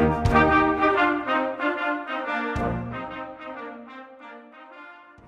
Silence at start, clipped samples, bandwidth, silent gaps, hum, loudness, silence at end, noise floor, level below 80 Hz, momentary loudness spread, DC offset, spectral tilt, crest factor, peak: 0 s; under 0.1%; 10 kHz; none; none; -23 LUFS; 0.25 s; -46 dBFS; -40 dBFS; 24 LU; under 0.1%; -7 dB/octave; 20 dB; -6 dBFS